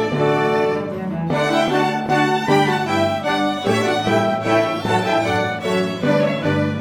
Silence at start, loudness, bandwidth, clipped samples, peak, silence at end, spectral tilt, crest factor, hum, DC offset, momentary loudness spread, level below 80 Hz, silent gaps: 0 s; -18 LUFS; 19 kHz; under 0.1%; -4 dBFS; 0 s; -5.5 dB/octave; 16 dB; none; 0.1%; 4 LU; -54 dBFS; none